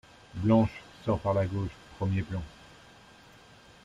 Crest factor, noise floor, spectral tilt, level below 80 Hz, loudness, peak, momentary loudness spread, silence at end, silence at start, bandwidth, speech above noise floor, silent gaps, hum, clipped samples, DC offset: 20 dB; -55 dBFS; -8.5 dB/octave; -52 dBFS; -30 LUFS; -12 dBFS; 14 LU; 1.35 s; 0.35 s; 10 kHz; 27 dB; none; none; under 0.1%; under 0.1%